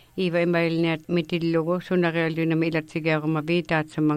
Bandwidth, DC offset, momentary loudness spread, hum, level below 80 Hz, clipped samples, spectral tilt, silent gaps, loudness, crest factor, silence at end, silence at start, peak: 13.5 kHz; under 0.1%; 3 LU; none; -60 dBFS; under 0.1%; -7.5 dB/octave; none; -24 LUFS; 14 dB; 0 s; 0.15 s; -10 dBFS